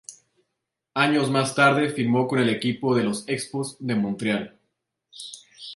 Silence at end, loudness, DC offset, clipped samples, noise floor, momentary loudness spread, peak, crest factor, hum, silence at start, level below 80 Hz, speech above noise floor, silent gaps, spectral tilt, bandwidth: 0 s; -23 LUFS; under 0.1%; under 0.1%; -81 dBFS; 20 LU; -4 dBFS; 20 dB; none; 0.1 s; -66 dBFS; 59 dB; none; -5 dB/octave; 11.5 kHz